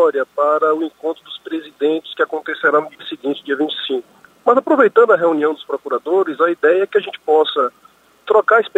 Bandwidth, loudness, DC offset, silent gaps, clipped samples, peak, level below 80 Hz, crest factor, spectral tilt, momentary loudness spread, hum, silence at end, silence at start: 8 kHz; -17 LUFS; under 0.1%; none; under 0.1%; 0 dBFS; -72 dBFS; 16 dB; -5.5 dB/octave; 12 LU; none; 0.1 s; 0 s